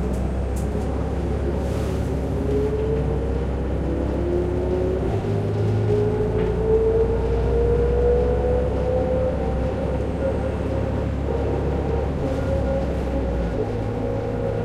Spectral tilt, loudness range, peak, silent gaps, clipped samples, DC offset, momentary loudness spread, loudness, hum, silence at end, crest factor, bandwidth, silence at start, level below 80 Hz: -8.5 dB/octave; 3 LU; -8 dBFS; none; under 0.1%; under 0.1%; 5 LU; -23 LUFS; none; 0 s; 14 dB; 10.5 kHz; 0 s; -28 dBFS